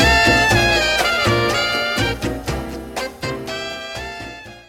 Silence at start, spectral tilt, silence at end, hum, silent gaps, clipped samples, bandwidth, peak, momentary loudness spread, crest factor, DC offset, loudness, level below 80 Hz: 0 s; -3.5 dB/octave; 0.05 s; none; none; under 0.1%; 16.5 kHz; -2 dBFS; 15 LU; 16 dB; under 0.1%; -17 LUFS; -32 dBFS